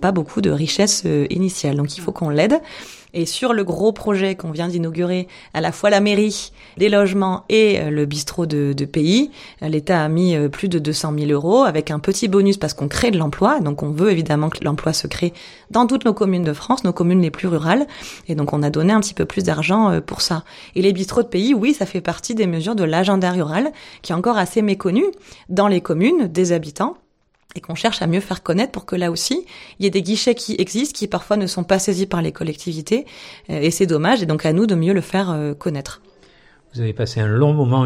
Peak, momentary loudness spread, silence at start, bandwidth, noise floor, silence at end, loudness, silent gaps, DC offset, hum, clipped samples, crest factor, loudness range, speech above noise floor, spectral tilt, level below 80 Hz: -2 dBFS; 9 LU; 0 s; 15.5 kHz; -59 dBFS; 0 s; -19 LUFS; none; under 0.1%; none; under 0.1%; 16 dB; 3 LU; 41 dB; -5.5 dB/octave; -48 dBFS